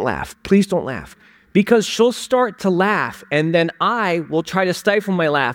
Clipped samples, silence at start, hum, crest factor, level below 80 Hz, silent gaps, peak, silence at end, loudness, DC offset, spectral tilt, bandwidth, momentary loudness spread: under 0.1%; 0 s; none; 16 dB; -50 dBFS; none; -2 dBFS; 0 s; -18 LUFS; under 0.1%; -5.5 dB/octave; 17 kHz; 5 LU